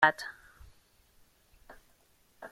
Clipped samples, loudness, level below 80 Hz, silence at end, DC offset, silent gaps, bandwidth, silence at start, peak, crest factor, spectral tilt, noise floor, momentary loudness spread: under 0.1%; -32 LUFS; -64 dBFS; 0.05 s; under 0.1%; none; 16 kHz; 0 s; -8 dBFS; 28 dB; -3.5 dB/octave; -67 dBFS; 24 LU